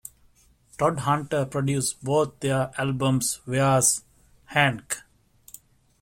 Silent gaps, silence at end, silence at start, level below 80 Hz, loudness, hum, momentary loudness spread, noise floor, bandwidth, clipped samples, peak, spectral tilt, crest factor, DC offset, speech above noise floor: none; 1 s; 0.8 s; -56 dBFS; -24 LUFS; none; 8 LU; -59 dBFS; 16.5 kHz; under 0.1%; -6 dBFS; -4 dB/octave; 20 dB; under 0.1%; 35 dB